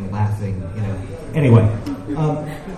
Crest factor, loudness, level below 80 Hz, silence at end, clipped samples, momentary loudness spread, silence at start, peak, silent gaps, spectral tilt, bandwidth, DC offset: 18 dB; -20 LUFS; -38 dBFS; 0 s; under 0.1%; 13 LU; 0 s; 0 dBFS; none; -9 dB/octave; 9.6 kHz; under 0.1%